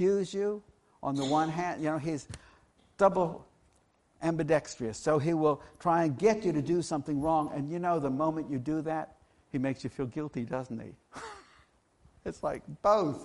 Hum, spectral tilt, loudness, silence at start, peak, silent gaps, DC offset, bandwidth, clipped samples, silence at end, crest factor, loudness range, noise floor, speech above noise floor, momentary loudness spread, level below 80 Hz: none; -6.5 dB/octave; -31 LUFS; 0 s; -12 dBFS; none; under 0.1%; 11.5 kHz; under 0.1%; 0 s; 20 dB; 8 LU; -68 dBFS; 38 dB; 16 LU; -60 dBFS